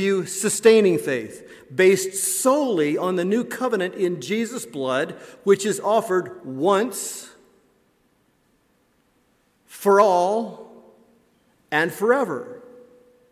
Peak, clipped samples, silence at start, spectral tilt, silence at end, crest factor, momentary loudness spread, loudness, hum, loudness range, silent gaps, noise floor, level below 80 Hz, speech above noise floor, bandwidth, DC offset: -4 dBFS; under 0.1%; 0 s; -4 dB/octave; 0.55 s; 18 dB; 14 LU; -21 LUFS; none; 7 LU; none; -64 dBFS; -72 dBFS; 43 dB; 16 kHz; under 0.1%